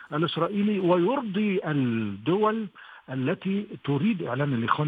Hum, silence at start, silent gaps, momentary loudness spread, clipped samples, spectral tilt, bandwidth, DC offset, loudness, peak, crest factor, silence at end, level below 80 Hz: none; 0 s; none; 8 LU; under 0.1%; -9.5 dB/octave; 4.9 kHz; under 0.1%; -26 LUFS; -6 dBFS; 20 dB; 0 s; -70 dBFS